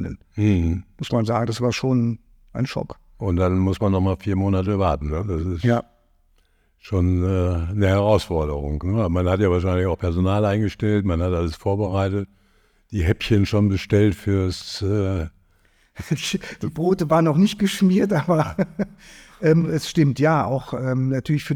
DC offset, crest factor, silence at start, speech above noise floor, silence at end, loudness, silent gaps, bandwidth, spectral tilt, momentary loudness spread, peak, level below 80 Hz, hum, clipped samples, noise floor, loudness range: under 0.1%; 16 dB; 0 s; 40 dB; 0 s; -21 LUFS; none; 14 kHz; -7 dB/octave; 9 LU; -4 dBFS; -38 dBFS; none; under 0.1%; -61 dBFS; 3 LU